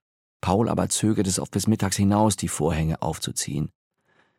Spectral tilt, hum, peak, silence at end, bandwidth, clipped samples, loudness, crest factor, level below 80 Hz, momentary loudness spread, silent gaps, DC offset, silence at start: -5 dB/octave; none; -6 dBFS; 0.7 s; 16.5 kHz; under 0.1%; -24 LUFS; 18 dB; -44 dBFS; 7 LU; none; under 0.1%; 0.45 s